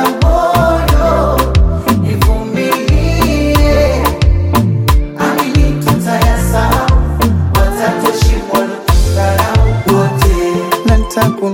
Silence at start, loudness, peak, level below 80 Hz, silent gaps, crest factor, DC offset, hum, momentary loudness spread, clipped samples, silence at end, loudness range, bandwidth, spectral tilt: 0 s; -12 LUFS; 0 dBFS; -14 dBFS; none; 10 dB; under 0.1%; none; 3 LU; under 0.1%; 0 s; 1 LU; 17 kHz; -6 dB/octave